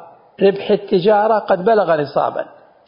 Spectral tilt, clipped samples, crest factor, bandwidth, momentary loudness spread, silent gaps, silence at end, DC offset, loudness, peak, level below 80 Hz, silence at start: -11 dB/octave; under 0.1%; 14 dB; 5.4 kHz; 7 LU; none; 0.4 s; under 0.1%; -16 LUFS; -2 dBFS; -62 dBFS; 0 s